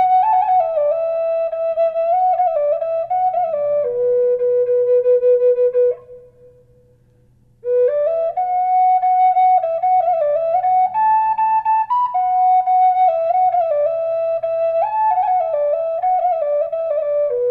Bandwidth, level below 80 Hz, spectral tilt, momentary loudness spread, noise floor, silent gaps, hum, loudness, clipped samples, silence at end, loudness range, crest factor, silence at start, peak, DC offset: 4.2 kHz; -60 dBFS; -6 dB/octave; 5 LU; -53 dBFS; none; none; -17 LUFS; under 0.1%; 0 s; 3 LU; 10 dB; 0 s; -8 dBFS; under 0.1%